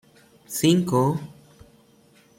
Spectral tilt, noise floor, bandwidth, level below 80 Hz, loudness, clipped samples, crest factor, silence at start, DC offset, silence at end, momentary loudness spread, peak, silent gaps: -5.5 dB/octave; -56 dBFS; 16.5 kHz; -62 dBFS; -22 LUFS; under 0.1%; 18 dB; 0.5 s; under 0.1%; 1.05 s; 13 LU; -8 dBFS; none